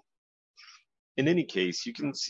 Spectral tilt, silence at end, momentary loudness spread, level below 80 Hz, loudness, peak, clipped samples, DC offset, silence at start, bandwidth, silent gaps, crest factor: -4.5 dB/octave; 0 s; 7 LU; -78 dBFS; -30 LUFS; -14 dBFS; under 0.1%; under 0.1%; 0.6 s; 8 kHz; 0.99-1.15 s; 18 dB